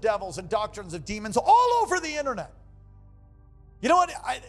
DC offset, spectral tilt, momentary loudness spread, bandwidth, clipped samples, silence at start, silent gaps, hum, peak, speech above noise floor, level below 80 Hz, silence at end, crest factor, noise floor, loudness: under 0.1%; -3.5 dB/octave; 15 LU; 13 kHz; under 0.1%; 0 s; none; 50 Hz at -60 dBFS; -10 dBFS; 27 dB; -52 dBFS; 0 s; 16 dB; -52 dBFS; -25 LUFS